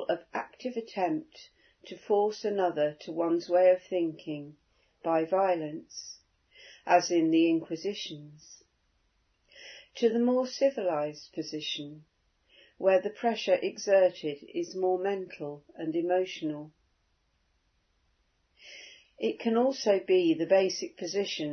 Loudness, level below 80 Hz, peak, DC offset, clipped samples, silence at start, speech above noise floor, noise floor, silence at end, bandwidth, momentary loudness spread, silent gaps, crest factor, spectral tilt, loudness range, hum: -29 LUFS; -78 dBFS; -10 dBFS; under 0.1%; under 0.1%; 0 s; 44 dB; -73 dBFS; 0 s; 6.6 kHz; 18 LU; none; 20 dB; -4.5 dB/octave; 6 LU; none